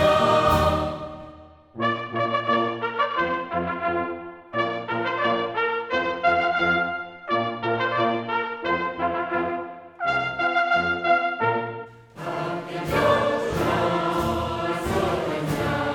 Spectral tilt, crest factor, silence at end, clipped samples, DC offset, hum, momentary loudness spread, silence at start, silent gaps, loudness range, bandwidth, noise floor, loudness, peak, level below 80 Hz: -5.5 dB/octave; 18 dB; 0 s; under 0.1%; under 0.1%; none; 10 LU; 0 s; none; 2 LU; 18 kHz; -46 dBFS; -24 LUFS; -6 dBFS; -46 dBFS